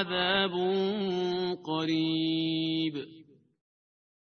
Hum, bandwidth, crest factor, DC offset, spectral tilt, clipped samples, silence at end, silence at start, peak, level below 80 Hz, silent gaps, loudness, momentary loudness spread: none; 6.6 kHz; 18 dB; under 0.1%; -6.5 dB/octave; under 0.1%; 1 s; 0 s; -12 dBFS; -68 dBFS; none; -29 LUFS; 6 LU